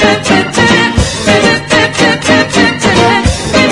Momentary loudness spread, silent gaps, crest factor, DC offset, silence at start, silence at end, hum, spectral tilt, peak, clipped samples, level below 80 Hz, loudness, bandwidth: 3 LU; none; 8 dB; under 0.1%; 0 s; 0 s; none; -4 dB/octave; 0 dBFS; 0.6%; -26 dBFS; -8 LUFS; 12 kHz